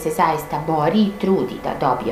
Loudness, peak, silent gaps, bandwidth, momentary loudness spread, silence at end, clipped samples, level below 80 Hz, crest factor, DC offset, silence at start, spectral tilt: -20 LUFS; -4 dBFS; none; 15.5 kHz; 5 LU; 0 s; under 0.1%; -46 dBFS; 16 dB; under 0.1%; 0 s; -6.5 dB/octave